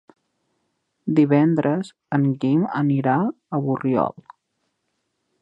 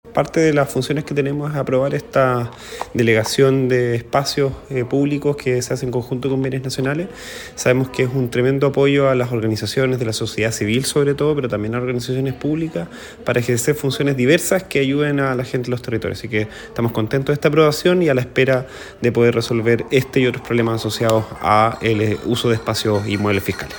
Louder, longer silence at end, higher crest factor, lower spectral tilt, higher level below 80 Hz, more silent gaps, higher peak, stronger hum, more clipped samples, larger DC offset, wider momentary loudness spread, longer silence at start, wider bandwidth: second, -21 LUFS vs -18 LUFS; first, 1.3 s vs 0 s; about the same, 18 dB vs 18 dB; first, -9.5 dB/octave vs -5.5 dB/octave; second, -66 dBFS vs -48 dBFS; neither; second, -4 dBFS vs 0 dBFS; neither; neither; neither; about the same, 9 LU vs 7 LU; first, 1.05 s vs 0.05 s; second, 8.6 kHz vs 18 kHz